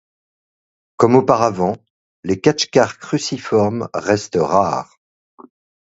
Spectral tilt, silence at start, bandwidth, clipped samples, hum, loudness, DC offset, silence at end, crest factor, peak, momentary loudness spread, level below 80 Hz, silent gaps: -5.5 dB/octave; 1 s; 8 kHz; under 0.1%; none; -17 LUFS; under 0.1%; 1 s; 18 dB; 0 dBFS; 10 LU; -52 dBFS; 1.90-2.23 s